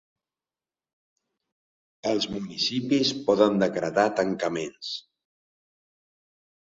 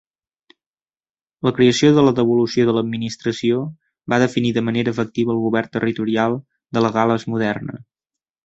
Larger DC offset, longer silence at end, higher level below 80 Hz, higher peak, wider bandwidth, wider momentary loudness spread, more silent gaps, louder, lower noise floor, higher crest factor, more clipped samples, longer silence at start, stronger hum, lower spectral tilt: neither; first, 1.65 s vs 0.65 s; second, -66 dBFS vs -56 dBFS; second, -6 dBFS vs -2 dBFS; about the same, 7.8 kHz vs 8 kHz; about the same, 11 LU vs 11 LU; neither; second, -25 LUFS vs -19 LUFS; about the same, under -90 dBFS vs under -90 dBFS; about the same, 22 dB vs 18 dB; neither; first, 2.05 s vs 1.45 s; neither; second, -4.5 dB/octave vs -6 dB/octave